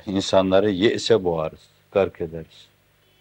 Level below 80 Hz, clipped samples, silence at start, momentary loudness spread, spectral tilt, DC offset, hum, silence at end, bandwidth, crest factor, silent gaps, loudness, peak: -58 dBFS; under 0.1%; 0.05 s; 14 LU; -5.5 dB/octave; under 0.1%; 50 Hz at -55 dBFS; 0.75 s; 16.5 kHz; 18 dB; none; -21 LUFS; -4 dBFS